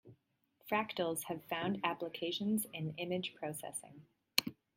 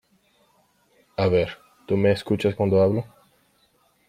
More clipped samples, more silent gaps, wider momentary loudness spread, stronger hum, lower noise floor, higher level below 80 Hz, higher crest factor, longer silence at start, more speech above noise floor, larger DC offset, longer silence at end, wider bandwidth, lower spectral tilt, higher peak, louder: neither; neither; second, 8 LU vs 15 LU; neither; first, -76 dBFS vs -64 dBFS; second, -80 dBFS vs -58 dBFS; first, 32 dB vs 18 dB; second, 0.05 s vs 1.2 s; second, 37 dB vs 43 dB; neither; second, 0.25 s vs 1.05 s; about the same, 16.5 kHz vs 15 kHz; second, -3.5 dB/octave vs -8 dB/octave; about the same, -8 dBFS vs -8 dBFS; second, -38 LUFS vs -23 LUFS